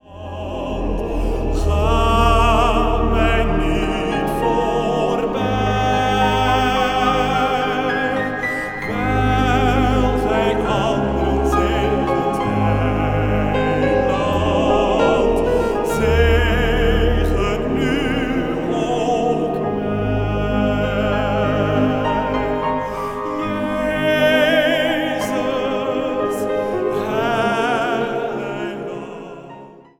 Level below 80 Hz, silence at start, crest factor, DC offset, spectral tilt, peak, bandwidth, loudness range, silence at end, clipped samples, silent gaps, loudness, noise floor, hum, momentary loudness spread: -26 dBFS; 0.1 s; 16 dB; under 0.1%; -6 dB/octave; -2 dBFS; 16.5 kHz; 3 LU; 0.25 s; under 0.1%; none; -18 LUFS; -39 dBFS; none; 7 LU